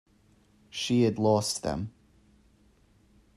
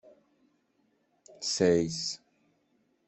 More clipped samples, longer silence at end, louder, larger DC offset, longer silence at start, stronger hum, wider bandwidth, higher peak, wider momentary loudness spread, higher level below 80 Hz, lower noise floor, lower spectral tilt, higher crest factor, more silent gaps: neither; first, 1.45 s vs 0.9 s; about the same, -28 LUFS vs -29 LUFS; neither; second, 0.75 s vs 1.4 s; neither; first, 13.5 kHz vs 8.4 kHz; about the same, -12 dBFS vs -12 dBFS; first, 15 LU vs 11 LU; first, -58 dBFS vs -66 dBFS; second, -63 dBFS vs -72 dBFS; about the same, -5 dB/octave vs -4 dB/octave; about the same, 20 dB vs 22 dB; neither